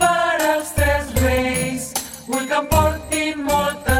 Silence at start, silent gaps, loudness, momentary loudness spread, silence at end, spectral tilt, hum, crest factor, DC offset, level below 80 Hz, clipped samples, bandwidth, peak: 0 s; none; -19 LUFS; 7 LU; 0 s; -4 dB/octave; none; 16 dB; under 0.1%; -30 dBFS; under 0.1%; 17 kHz; -2 dBFS